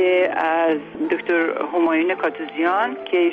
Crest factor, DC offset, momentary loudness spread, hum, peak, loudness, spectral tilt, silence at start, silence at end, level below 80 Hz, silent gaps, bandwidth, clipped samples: 12 dB; under 0.1%; 5 LU; none; -8 dBFS; -20 LUFS; -6.5 dB/octave; 0 s; 0 s; -70 dBFS; none; 4.6 kHz; under 0.1%